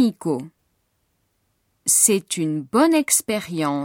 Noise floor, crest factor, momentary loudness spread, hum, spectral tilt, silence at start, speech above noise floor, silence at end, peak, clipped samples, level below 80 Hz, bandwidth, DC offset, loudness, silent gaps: -69 dBFS; 20 dB; 11 LU; none; -3.5 dB/octave; 0 s; 49 dB; 0 s; -2 dBFS; under 0.1%; -66 dBFS; 17 kHz; under 0.1%; -19 LUFS; none